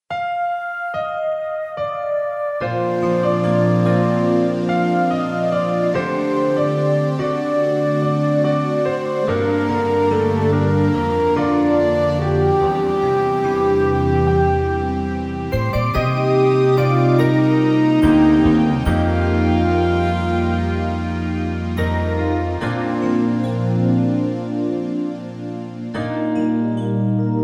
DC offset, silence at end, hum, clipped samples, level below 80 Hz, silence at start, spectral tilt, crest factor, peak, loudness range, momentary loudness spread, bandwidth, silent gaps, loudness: under 0.1%; 0 s; none; under 0.1%; -36 dBFS; 0.1 s; -8.5 dB/octave; 14 dB; -4 dBFS; 5 LU; 8 LU; 11.5 kHz; none; -18 LUFS